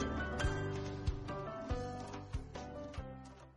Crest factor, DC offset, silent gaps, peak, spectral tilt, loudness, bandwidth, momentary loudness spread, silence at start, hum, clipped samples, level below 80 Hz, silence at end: 16 dB; under 0.1%; none; -26 dBFS; -6 dB/octave; -42 LUFS; 11 kHz; 10 LU; 0 s; none; under 0.1%; -46 dBFS; 0 s